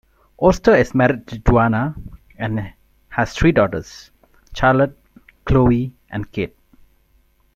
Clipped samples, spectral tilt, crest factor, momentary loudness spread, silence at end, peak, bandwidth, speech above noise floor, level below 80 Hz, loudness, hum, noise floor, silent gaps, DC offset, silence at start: under 0.1%; -7.5 dB/octave; 18 dB; 15 LU; 1.1 s; -2 dBFS; 13.5 kHz; 41 dB; -32 dBFS; -18 LUFS; none; -58 dBFS; none; under 0.1%; 0.4 s